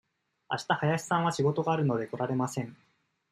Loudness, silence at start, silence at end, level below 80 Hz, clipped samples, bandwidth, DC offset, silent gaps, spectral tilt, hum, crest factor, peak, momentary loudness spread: -30 LUFS; 0.5 s; 0.55 s; -70 dBFS; under 0.1%; 14.5 kHz; under 0.1%; none; -6 dB/octave; none; 18 dB; -12 dBFS; 9 LU